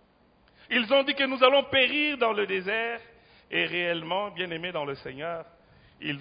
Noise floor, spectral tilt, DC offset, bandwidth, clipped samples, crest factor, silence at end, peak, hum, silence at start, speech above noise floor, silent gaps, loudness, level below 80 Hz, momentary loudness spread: -62 dBFS; -8 dB/octave; under 0.1%; 5.2 kHz; under 0.1%; 24 dB; 0 s; -4 dBFS; none; 0.7 s; 35 dB; none; -26 LUFS; -66 dBFS; 14 LU